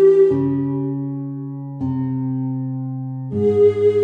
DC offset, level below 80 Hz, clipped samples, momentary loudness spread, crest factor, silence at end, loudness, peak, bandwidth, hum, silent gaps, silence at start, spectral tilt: under 0.1%; -60 dBFS; under 0.1%; 13 LU; 14 dB; 0 s; -20 LUFS; -4 dBFS; 4 kHz; none; none; 0 s; -10.5 dB/octave